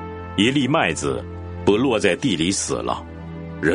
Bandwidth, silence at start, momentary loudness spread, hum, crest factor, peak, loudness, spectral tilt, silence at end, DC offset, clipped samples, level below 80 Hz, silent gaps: 10.5 kHz; 0 s; 14 LU; none; 20 dB; -2 dBFS; -21 LUFS; -4.5 dB/octave; 0 s; under 0.1%; under 0.1%; -44 dBFS; none